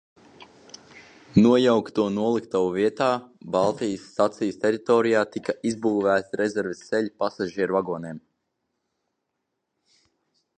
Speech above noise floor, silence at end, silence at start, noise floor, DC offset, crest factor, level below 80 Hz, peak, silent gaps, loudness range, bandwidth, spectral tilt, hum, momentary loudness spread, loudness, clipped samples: 56 dB; 2.4 s; 0.4 s; -79 dBFS; under 0.1%; 20 dB; -62 dBFS; -4 dBFS; none; 8 LU; 9.6 kHz; -6 dB/octave; none; 10 LU; -24 LUFS; under 0.1%